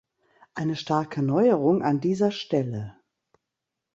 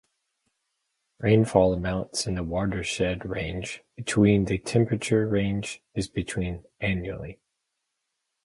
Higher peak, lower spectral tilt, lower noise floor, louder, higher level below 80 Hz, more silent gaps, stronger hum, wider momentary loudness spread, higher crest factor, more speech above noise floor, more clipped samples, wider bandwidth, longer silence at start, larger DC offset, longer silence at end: about the same, -8 dBFS vs -6 dBFS; first, -7.5 dB/octave vs -6 dB/octave; first, -85 dBFS vs -81 dBFS; about the same, -25 LUFS vs -26 LUFS; second, -64 dBFS vs -46 dBFS; neither; neither; about the same, 13 LU vs 13 LU; about the same, 18 dB vs 22 dB; first, 61 dB vs 55 dB; neither; second, 8 kHz vs 11.5 kHz; second, 0.55 s vs 1.2 s; neither; about the same, 1.05 s vs 1.1 s